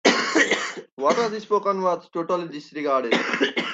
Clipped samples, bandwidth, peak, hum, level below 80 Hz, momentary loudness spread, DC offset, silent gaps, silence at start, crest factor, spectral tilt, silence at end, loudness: under 0.1%; 9.2 kHz; -2 dBFS; none; -70 dBFS; 8 LU; under 0.1%; 0.92-0.97 s; 0.05 s; 22 dB; -3 dB/octave; 0 s; -23 LUFS